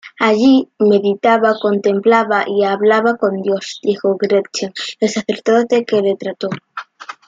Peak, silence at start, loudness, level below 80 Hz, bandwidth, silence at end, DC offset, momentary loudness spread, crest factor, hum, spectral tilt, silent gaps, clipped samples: -2 dBFS; 0.05 s; -15 LUFS; -64 dBFS; 7.8 kHz; 0.15 s; under 0.1%; 10 LU; 14 dB; none; -5 dB/octave; none; under 0.1%